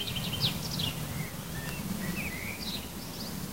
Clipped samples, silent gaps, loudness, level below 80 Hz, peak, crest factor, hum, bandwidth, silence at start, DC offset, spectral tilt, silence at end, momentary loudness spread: under 0.1%; none; -34 LUFS; -50 dBFS; -14 dBFS; 20 dB; none; 16 kHz; 0 s; 0.3%; -3.5 dB/octave; 0 s; 7 LU